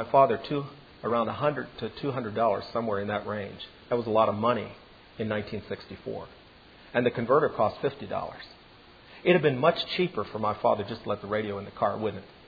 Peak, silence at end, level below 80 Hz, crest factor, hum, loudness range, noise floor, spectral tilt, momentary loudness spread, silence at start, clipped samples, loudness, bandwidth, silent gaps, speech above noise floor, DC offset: -6 dBFS; 0.15 s; -60 dBFS; 22 dB; none; 3 LU; -53 dBFS; -8.5 dB/octave; 15 LU; 0 s; under 0.1%; -28 LUFS; 5 kHz; none; 25 dB; under 0.1%